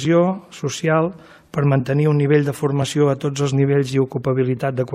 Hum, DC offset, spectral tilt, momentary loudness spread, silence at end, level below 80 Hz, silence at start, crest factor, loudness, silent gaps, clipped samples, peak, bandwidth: none; under 0.1%; -7 dB/octave; 6 LU; 0 s; -56 dBFS; 0 s; 16 dB; -19 LUFS; none; under 0.1%; -4 dBFS; 13.5 kHz